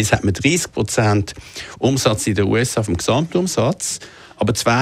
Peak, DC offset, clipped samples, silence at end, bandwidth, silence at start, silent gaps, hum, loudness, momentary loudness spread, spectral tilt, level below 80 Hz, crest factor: -2 dBFS; under 0.1%; under 0.1%; 0 s; 16 kHz; 0 s; none; none; -18 LUFS; 10 LU; -4.5 dB/octave; -42 dBFS; 16 dB